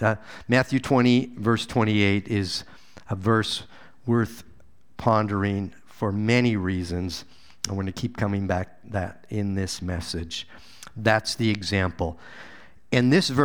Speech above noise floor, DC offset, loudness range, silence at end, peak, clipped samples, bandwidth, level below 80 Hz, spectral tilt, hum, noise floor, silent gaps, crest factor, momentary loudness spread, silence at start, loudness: 33 dB; 0.5%; 6 LU; 0 s; -4 dBFS; under 0.1%; 17 kHz; -50 dBFS; -5.5 dB/octave; none; -57 dBFS; none; 22 dB; 13 LU; 0 s; -25 LUFS